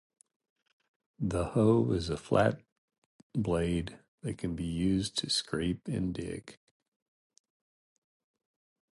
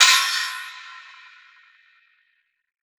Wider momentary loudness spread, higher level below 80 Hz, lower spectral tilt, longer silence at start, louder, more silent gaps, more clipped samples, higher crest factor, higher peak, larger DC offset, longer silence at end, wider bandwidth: second, 14 LU vs 26 LU; first, -52 dBFS vs under -90 dBFS; first, -6 dB/octave vs 7 dB/octave; first, 1.2 s vs 0 s; second, -31 LUFS vs -19 LUFS; first, 2.72-2.88 s, 2.98-3.30 s, 4.08-4.18 s vs none; neither; about the same, 22 dB vs 24 dB; second, -12 dBFS vs 0 dBFS; neither; first, 2.4 s vs 2 s; second, 11.5 kHz vs over 20 kHz